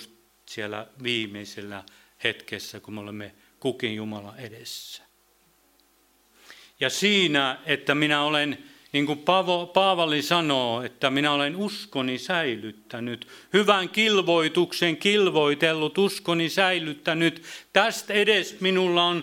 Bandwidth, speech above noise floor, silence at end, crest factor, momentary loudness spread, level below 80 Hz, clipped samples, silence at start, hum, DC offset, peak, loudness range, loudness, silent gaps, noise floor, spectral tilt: 16.5 kHz; 38 dB; 0 s; 24 dB; 17 LU; -72 dBFS; under 0.1%; 0 s; none; under 0.1%; -2 dBFS; 12 LU; -23 LUFS; none; -63 dBFS; -4 dB/octave